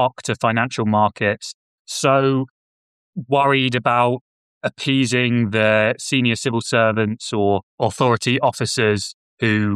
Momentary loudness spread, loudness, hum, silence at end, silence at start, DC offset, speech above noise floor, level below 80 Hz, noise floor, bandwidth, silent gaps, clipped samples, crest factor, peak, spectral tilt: 12 LU; -19 LUFS; none; 0 s; 0 s; under 0.1%; over 72 dB; -60 dBFS; under -90 dBFS; 13.5 kHz; 1.54-1.85 s, 2.50-3.13 s, 4.21-4.61 s, 7.63-7.78 s, 9.14-9.37 s; under 0.1%; 16 dB; -4 dBFS; -5 dB/octave